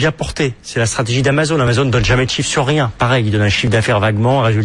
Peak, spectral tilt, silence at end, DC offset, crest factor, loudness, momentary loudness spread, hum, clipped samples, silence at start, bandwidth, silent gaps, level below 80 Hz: -2 dBFS; -5 dB/octave; 0 s; under 0.1%; 12 dB; -15 LUFS; 5 LU; none; under 0.1%; 0 s; 11 kHz; none; -34 dBFS